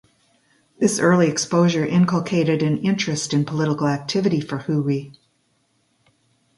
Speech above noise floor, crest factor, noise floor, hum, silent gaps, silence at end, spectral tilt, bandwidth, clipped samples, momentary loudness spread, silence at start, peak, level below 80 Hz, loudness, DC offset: 46 dB; 18 dB; -66 dBFS; none; none; 1.45 s; -5.5 dB/octave; 11.5 kHz; under 0.1%; 6 LU; 0.8 s; -4 dBFS; -60 dBFS; -20 LUFS; under 0.1%